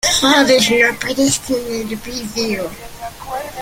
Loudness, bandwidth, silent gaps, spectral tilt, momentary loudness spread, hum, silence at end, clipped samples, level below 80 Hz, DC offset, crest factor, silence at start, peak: -15 LUFS; 17 kHz; none; -2.5 dB/octave; 17 LU; none; 0 s; under 0.1%; -42 dBFS; under 0.1%; 16 dB; 0.05 s; 0 dBFS